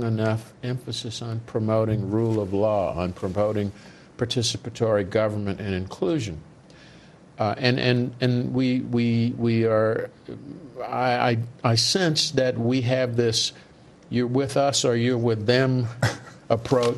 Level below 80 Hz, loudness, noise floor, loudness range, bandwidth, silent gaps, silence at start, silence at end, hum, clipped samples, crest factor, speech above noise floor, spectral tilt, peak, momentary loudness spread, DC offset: -54 dBFS; -24 LUFS; -49 dBFS; 4 LU; 12.5 kHz; none; 0 s; 0 s; none; under 0.1%; 20 dB; 26 dB; -5 dB/octave; -4 dBFS; 10 LU; under 0.1%